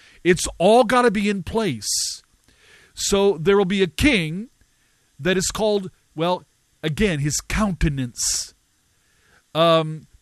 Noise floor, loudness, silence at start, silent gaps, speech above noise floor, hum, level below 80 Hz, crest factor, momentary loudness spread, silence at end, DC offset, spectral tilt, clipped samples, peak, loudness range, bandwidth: -63 dBFS; -20 LUFS; 0.25 s; none; 44 dB; none; -38 dBFS; 18 dB; 12 LU; 0.2 s; under 0.1%; -4 dB/octave; under 0.1%; -4 dBFS; 4 LU; 14 kHz